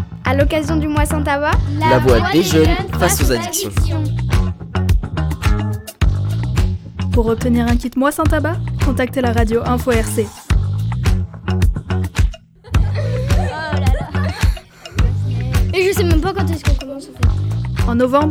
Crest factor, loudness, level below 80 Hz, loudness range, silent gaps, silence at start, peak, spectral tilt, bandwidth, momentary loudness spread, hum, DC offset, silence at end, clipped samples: 16 dB; -17 LUFS; -22 dBFS; 4 LU; none; 0 s; 0 dBFS; -6 dB/octave; 17.5 kHz; 7 LU; none; under 0.1%; 0 s; under 0.1%